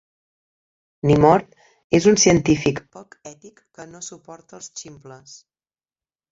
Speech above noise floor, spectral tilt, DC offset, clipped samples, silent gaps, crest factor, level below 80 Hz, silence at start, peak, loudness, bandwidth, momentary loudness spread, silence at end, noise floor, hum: over 70 dB; -5 dB/octave; under 0.1%; under 0.1%; 1.84-1.90 s; 20 dB; -48 dBFS; 1.05 s; -2 dBFS; -17 LUFS; 8 kHz; 22 LU; 1.15 s; under -90 dBFS; none